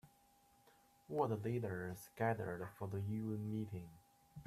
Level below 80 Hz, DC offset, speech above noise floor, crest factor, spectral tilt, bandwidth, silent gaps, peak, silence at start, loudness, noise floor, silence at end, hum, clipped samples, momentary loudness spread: -74 dBFS; under 0.1%; 30 dB; 20 dB; -8 dB/octave; 14.5 kHz; none; -24 dBFS; 0.05 s; -43 LUFS; -71 dBFS; 0.05 s; none; under 0.1%; 10 LU